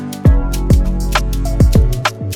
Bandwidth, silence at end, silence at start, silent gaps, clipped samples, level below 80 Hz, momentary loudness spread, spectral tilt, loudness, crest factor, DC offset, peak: 16.5 kHz; 0 s; 0 s; none; under 0.1%; -14 dBFS; 5 LU; -6 dB/octave; -15 LUFS; 12 dB; under 0.1%; 0 dBFS